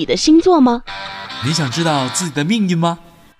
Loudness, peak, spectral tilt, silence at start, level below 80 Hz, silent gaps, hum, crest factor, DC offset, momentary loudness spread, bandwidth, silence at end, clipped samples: -15 LUFS; -4 dBFS; -5 dB/octave; 0 s; -44 dBFS; none; none; 12 dB; under 0.1%; 16 LU; 13 kHz; 0.4 s; under 0.1%